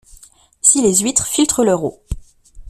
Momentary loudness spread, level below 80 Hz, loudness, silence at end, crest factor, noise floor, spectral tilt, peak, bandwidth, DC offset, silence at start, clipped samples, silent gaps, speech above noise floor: 20 LU; -36 dBFS; -14 LUFS; 0 s; 18 dB; -46 dBFS; -3 dB/octave; 0 dBFS; 16 kHz; under 0.1%; 0.15 s; under 0.1%; none; 30 dB